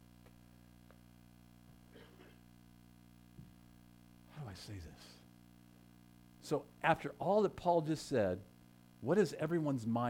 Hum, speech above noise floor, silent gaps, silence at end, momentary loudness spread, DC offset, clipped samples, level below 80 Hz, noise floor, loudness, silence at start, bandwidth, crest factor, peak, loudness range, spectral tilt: 60 Hz at -65 dBFS; 27 dB; none; 0 s; 25 LU; under 0.1%; under 0.1%; -68 dBFS; -62 dBFS; -36 LUFS; 0.9 s; 17 kHz; 22 dB; -18 dBFS; 19 LU; -6.5 dB/octave